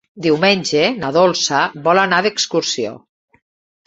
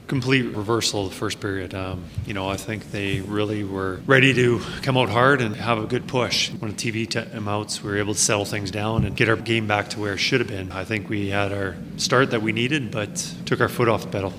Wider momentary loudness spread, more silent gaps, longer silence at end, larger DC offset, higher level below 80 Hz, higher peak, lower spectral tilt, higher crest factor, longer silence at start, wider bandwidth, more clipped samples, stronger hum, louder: second, 5 LU vs 10 LU; neither; first, 0.9 s vs 0 s; neither; second, -58 dBFS vs -48 dBFS; about the same, 0 dBFS vs 0 dBFS; about the same, -3.5 dB/octave vs -4.5 dB/octave; second, 16 dB vs 22 dB; first, 0.15 s vs 0 s; second, 8.2 kHz vs 16 kHz; neither; neither; first, -15 LUFS vs -23 LUFS